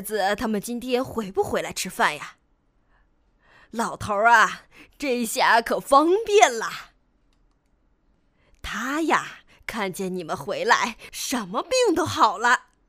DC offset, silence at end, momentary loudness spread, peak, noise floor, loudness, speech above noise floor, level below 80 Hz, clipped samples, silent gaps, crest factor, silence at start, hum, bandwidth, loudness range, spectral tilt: under 0.1%; 0.3 s; 14 LU; 0 dBFS; -65 dBFS; -22 LUFS; 42 dB; -54 dBFS; under 0.1%; none; 24 dB; 0 s; none; 15.5 kHz; 9 LU; -3 dB/octave